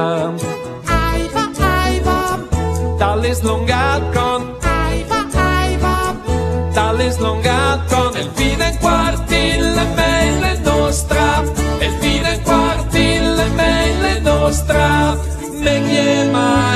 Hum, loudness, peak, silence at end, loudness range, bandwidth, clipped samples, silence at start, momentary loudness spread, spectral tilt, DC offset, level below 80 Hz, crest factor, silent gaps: none; -16 LUFS; 0 dBFS; 0 s; 2 LU; 14 kHz; under 0.1%; 0 s; 5 LU; -5 dB/octave; under 0.1%; -22 dBFS; 14 dB; none